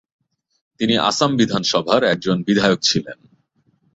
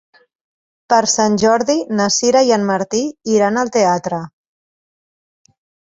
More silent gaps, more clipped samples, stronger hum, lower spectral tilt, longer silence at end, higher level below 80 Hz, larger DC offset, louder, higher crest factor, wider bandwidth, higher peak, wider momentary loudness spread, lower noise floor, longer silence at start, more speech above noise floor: neither; neither; neither; about the same, -4 dB/octave vs -3.5 dB/octave; second, 0.8 s vs 1.65 s; about the same, -56 dBFS vs -58 dBFS; neither; about the same, -17 LUFS vs -15 LUFS; about the same, 18 dB vs 16 dB; about the same, 8 kHz vs 8 kHz; about the same, -2 dBFS vs 0 dBFS; about the same, 6 LU vs 7 LU; second, -63 dBFS vs under -90 dBFS; about the same, 0.8 s vs 0.9 s; second, 45 dB vs over 75 dB